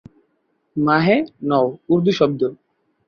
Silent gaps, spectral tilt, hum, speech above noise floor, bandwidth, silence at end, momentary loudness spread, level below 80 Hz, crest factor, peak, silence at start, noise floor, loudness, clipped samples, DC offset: none; -7.5 dB/octave; none; 50 dB; 6.8 kHz; 0.55 s; 8 LU; -58 dBFS; 18 dB; -2 dBFS; 0.75 s; -67 dBFS; -18 LUFS; under 0.1%; under 0.1%